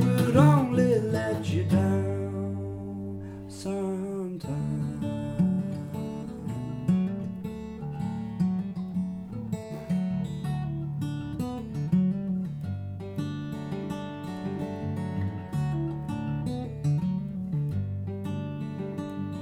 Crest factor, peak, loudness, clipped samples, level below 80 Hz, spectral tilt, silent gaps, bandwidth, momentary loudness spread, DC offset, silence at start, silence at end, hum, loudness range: 20 dB; -8 dBFS; -30 LUFS; under 0.1%; -52 dBFS; -8 dB/octave; none; 15 kHz; 11 LU; under 0.1%; 0 s; 0 s; none; 4 LU